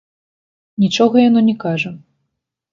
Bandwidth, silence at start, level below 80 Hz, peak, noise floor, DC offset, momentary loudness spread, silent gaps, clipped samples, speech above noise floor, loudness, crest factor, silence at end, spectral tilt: 7.4 kHz; 0.8 s; -62 dBFS; 0 dBFS; -75 dBFS; under 0.1%; 12 LU; none; under 0.1%; 62 dB; -15 LUFS; 16 dB; 0.75 s; -6 dB/octave